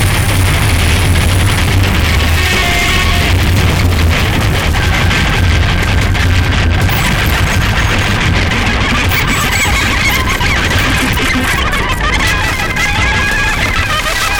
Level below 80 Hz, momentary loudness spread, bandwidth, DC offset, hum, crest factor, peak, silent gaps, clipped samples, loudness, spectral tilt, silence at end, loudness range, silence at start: -16 dBFS; 2 LU; 17.5 kHz; under 0.1%; none; 10 dB; 0 dBFS; none; under 0.1%; -11 LUFS; -4 dB/octave; 0 s; 1 LU; 0 s